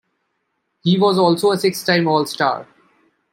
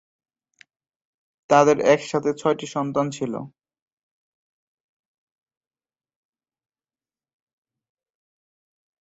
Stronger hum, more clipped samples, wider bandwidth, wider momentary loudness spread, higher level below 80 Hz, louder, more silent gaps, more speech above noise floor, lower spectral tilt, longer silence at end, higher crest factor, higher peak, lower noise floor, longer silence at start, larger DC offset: neither; neither; first, 16.5 kHz vs 8 kHz; second, 6 LU vs 13 LU; about the same, -66 dBFS vs -68 dBFS; first, -17 LUFS vs -21 LUFS; neither; second, 55 dB vs over 70 dB; about the same, -5.5 dB/octave vs -5.5 dB/octave; second, 0.7 s vs 5.55 s; second, 16 dB vs 24 dB; about the same, -2 dBFS vs -4 dBFS; second, -72 dBFS vs under -90 dBFS; second, 0.85 s vs 1.5 s; neither